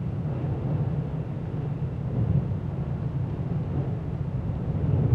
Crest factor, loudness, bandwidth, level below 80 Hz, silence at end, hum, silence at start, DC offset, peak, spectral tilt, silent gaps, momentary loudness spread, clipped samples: 16 dB; -29 LUFS; 4.5 kHz; -40 dBFS; 0 s; none; 0 s; under 0.1%; -10 dBFS; -11 dB/octave; none; 5 LU; under 0.1%